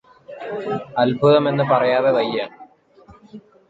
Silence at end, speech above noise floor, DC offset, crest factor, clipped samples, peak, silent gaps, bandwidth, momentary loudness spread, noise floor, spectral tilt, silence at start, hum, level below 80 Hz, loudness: 0.3 s; 31 dB; under 0.1%; 16 dB; under 0.1%; -4 dBFS; none; 7.8 kHz; 15 LU; -49 dBFS; -8 dB/octave; 0.3 s; none; -60 dBFS; -18 LUFS